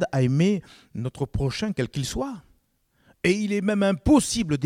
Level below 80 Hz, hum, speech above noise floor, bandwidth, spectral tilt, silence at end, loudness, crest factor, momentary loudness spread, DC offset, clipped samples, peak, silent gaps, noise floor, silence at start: -44 dBFS; none; 44 dB; 16 kHz; -5.5 dB/octave; 0 s; -24 LUFS; 18 dB; 14 LU; under 0.1%; under 0.1%; -6 dBFS; none; -67 dBFS; 0 s